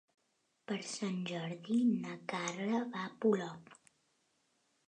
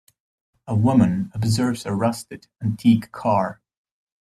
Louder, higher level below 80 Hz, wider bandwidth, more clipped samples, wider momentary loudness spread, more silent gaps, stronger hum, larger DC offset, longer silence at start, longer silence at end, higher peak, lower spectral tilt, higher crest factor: second, -37 LUFS vs -21 LUFS; second, -88 dBFS vs -54 dBFS; second, 9.8 kHz vs 14 kHz; neither; about the same, 10 LU vs 11 LU; neither; neither; neither; about the same, 0.7 s vs 0.65 s; first, 1.15 s vs 0.65 s; second, -20 dBFS vs -6 dBFS; second, -5 dB/octave vs -7 dB/octave; about the same, 18 dB vs 16 dB